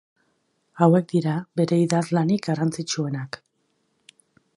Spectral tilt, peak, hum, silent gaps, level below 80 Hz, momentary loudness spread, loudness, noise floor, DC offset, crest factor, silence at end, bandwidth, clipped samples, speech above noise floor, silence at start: -6.5 dB/octave; -4 dBFS; none; none; -68 dBFS; 11 LU; -23 LUFS; -71 dBFS; under 0.1%; 20 dB; 1.3 s; 11.5 kHz; under 0.1%; 49 dB; 0.75 s